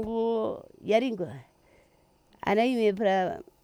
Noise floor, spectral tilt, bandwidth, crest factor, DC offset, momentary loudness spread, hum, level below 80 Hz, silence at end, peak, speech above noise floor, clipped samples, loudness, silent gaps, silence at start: -64 dBFS; -6.5 dB/octave; 13.5 kHz; 18 dB; under 0.1%; 12 LU; none; -62 dBFS; 0.2 s; -12 dBFS; 37 dB; under 0.1%; -28 LUFS; none; 0 s